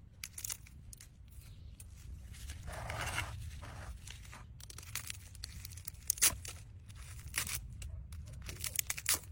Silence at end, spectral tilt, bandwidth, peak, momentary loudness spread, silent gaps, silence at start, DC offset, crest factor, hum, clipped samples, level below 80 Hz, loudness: 0 s; -1 dB/octave; 17 kHz; -10 dBFS; 20 LU; none; 0 s; under 0.1%; 32 dB; none; under 0.1%; -52 dBFS; -39 LUFS